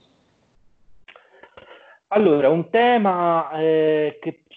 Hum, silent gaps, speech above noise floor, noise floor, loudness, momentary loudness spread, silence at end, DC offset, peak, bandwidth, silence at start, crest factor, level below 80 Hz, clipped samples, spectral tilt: none; none; 43 dB; -61 dBFS; -19 LUFS; 7 LU; 0.25 s; under 0.1%; -6 dBFS; 4.4 kHz; 2.1 s; 16 dB; -68 dBFS; under 0.1%; -9 dB/octave